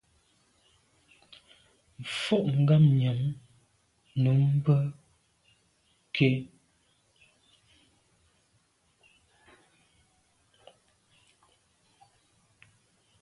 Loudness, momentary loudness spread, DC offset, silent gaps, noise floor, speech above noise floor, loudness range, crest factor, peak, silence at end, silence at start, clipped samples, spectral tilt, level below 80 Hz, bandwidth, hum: -26 LUFS; 15 LU; under 0.1%; none; -70 dBFS; 45 dB; 8 LU; 22 dB; -10 dBFS; 6.75 s; 2 s; under 0.1%; -7.5 dB/octave; -68 dBFS; 11 kHz; none